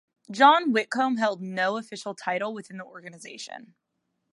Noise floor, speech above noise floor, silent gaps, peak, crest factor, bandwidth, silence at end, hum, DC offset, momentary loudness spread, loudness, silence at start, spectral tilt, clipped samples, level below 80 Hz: -78 dBFS; 53 dB; none; -4 dBFS; 22 dB; 11.5 kHz; 0.75 s; none; under 0.1%; 23 LU; -24 LUFS; 0.3 s; -4 dB/octave; under 0.1%; -84 dBFS